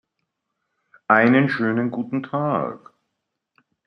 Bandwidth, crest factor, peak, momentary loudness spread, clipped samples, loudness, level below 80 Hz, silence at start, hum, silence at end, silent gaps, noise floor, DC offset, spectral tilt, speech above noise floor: 5.8 kHz; 22 dB; -2 dBFS; 12 LU; under 0.1%; -20 LUFS; -68 dBFS; 1.1 s; none; 1.1 s; none; -79 dBFS; under 0.1%; -9 dB/octave; 59 dB